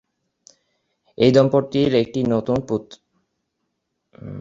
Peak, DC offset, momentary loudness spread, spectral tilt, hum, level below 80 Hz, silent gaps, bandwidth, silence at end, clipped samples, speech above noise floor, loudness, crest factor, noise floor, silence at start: -2 dBFS; under 0.1%; 12 LU; -7.5 dB/octave; none; -52 dBFS; none; 7.8 kHz; 0 s; under 0.1%; 57 dB; -19 LUFS; 20 dB; -75 dBFS; 1.2 s